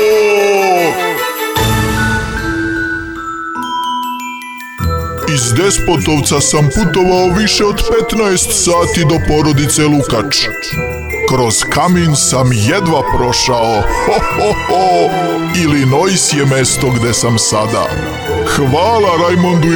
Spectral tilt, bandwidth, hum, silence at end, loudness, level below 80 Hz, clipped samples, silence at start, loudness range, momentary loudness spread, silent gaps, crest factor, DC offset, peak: -4 dB/octave; over 20 kHz; none; 0 s; -12 LUFS; -28 dBFS; under 0.1%; 0 s; 5 LU; 8 LU; none; 10 dB; under 0.1%; -2 dBFS